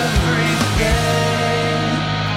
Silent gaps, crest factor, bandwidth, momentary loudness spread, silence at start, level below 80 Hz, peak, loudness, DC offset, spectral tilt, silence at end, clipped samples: none; 12 dB; 16.5 kHz; 2 LU; 0 s; -26 dBFS; -6 dBFS; -17 LUFS; under 0.1%; -4.5 dB/octave; 0 s; under 0.1%